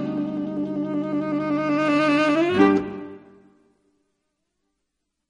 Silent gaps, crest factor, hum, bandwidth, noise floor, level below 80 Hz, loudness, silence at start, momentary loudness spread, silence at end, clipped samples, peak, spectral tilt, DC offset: none; 20 dB; none; 9.4 kHz; -79 dBFS; -62 dBFS; -22 LUFS; 0 s; 9 LU; 2.1 s; under 0.1%; -4 dBFS; -6.5 dB/octave; under 0.1%